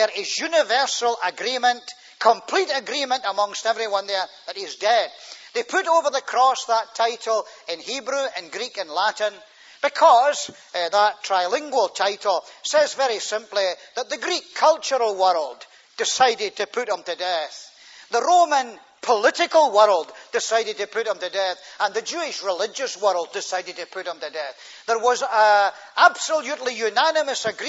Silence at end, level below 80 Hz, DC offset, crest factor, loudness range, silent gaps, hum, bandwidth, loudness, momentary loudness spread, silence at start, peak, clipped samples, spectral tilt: 0 s; -82 dBFS; under 0.1%; 20 dB; 5 LU; none; none; 8 kHz; -22 LUFS; 13 LU; 0 s; -2 dBFS; under 0.1%; 0 dB/octave